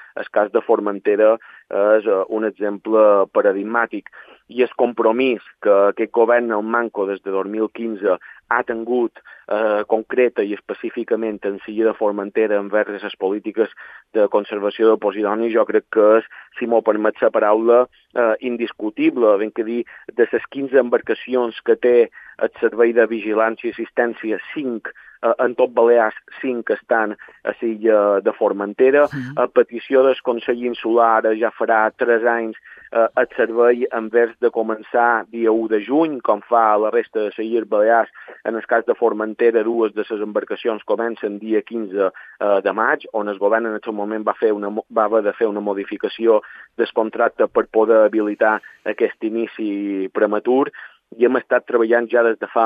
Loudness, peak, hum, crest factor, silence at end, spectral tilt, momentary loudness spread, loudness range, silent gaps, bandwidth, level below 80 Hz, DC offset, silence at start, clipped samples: -19 LUFS; -2 dBFS; none; 18 dB; 0 s; -8 dB/octave; 9 LU; 4 LU; none; 4.9 kHz; -70 dBFS; under 0.1%; 0 s; under 0.1%